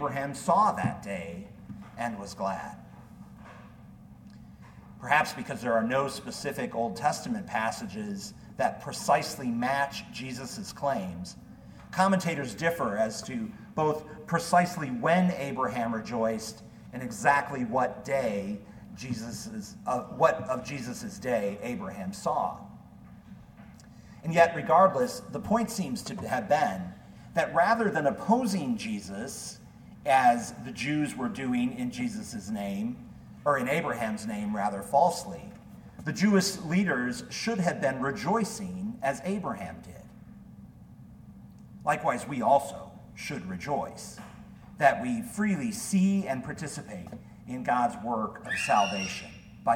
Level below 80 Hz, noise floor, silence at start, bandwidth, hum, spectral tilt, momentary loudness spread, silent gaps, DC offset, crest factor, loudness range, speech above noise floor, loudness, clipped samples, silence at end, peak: -60 dBFS; -50 dBFS; 0 s; 17 kHz; none; -5 dB/octave; 21 LU; none; under 0.1%; 24 dB; 6 LU; 21 dB; -29 LUFS; under 0.1%; 0 s; -6 dBFS